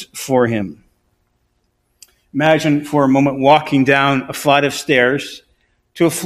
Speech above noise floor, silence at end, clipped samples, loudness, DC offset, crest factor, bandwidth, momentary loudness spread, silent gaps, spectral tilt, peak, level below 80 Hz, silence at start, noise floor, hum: 50 dB; 0 s; under 0.1%; -15 LUFS; under 0.1%; 16 dB; 15.5 kHz; 10 LU; none; -5 dB/octave; 0 dBFS; -54 dBFS; 0 s; -65 dBFS; none